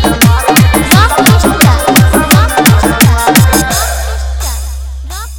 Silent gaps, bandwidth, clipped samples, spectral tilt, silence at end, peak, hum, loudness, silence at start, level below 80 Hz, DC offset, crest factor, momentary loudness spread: none; over 20 kHz; 2%; -4.5 dB/octave; 0 s; 0 dBFS; none; -7 LUFS; 0 s; -16 dBFS; under 0.1%; 8 dB; 12 LU